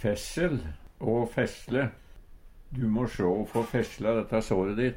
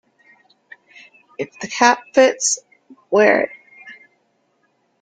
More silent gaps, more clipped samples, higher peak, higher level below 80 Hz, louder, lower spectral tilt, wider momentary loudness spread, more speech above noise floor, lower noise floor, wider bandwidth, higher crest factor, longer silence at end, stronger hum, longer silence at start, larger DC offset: neither; neither; second, -12 dBFS vs 0 dBFS; first, -46 dBFS vs -68 dBFS; second, -29 LUFS vs -17 LUFS; first, -6.5 dB/octave vs -2 dB/octave; second, 7 LU vs 25 LU; second, 21 dB vs 49 dB; second, -49 dBFS vs -65 dBFS; first, 16.5 kHz vs 9.6 kHz; about the same, 16 dB vs 20 dB; second, 0 s vs 1.1 s; neither; second, 0 s vs 1.4 s; neither